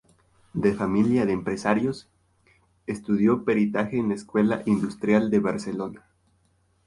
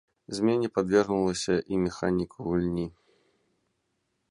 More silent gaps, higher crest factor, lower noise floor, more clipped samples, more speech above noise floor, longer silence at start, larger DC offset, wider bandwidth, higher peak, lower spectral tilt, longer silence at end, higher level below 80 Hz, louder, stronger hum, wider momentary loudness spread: neither; about the same, 18 dB vs 20 dB; second, -66 dBFS vs -77 dBFS; neither; second, 42 dB vs 50 dB; first, 0.55 s vs 0.3 s; neither; about the same, 11.5 kHz vs 11.5 kHz; first, -6 dBFS vs -10 dBFS; first, -7.5 dB/octave vs -6 dB/octave; second, 0.9 s vs 1.4 s; about the same, -56 dBFS vs -54 dBFS; first, -24 LUFS vs -28 LUFS; neither; first, 12 LU vs 7 LU